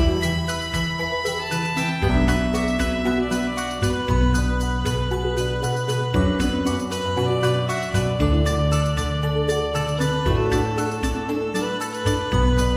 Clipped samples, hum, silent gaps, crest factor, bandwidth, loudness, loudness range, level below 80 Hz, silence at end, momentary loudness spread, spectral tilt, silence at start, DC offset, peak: under 0.1%; none; none; 14 dB; 16 kHz; -22 LUFS; 1 LU; -28 dBFS; 0 s; 4 LU; -5.5 dB/octave; 0 s; under 0.1%; -6 dBFS